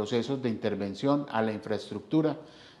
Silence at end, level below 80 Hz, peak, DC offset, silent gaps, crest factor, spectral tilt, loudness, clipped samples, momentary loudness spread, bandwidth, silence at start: 0.1 s; -72 dBFS; -12 dBFS; under 0.1%; none; 18 dB; -7 dB/octave; -30 LUFS; under 0.1%; 7 LU; 11.5 kHz; 0 s